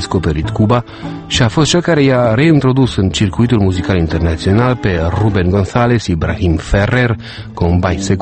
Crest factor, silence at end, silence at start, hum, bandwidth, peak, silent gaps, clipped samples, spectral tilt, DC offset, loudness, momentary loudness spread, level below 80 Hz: 12 dB; 0 s; 0 s; none; 8.8 kHz; 0 dBFS; none; under 0.1%; -6 dB/octave; under 0.1%; -13 LUFS; 6 LU; -28 dBFS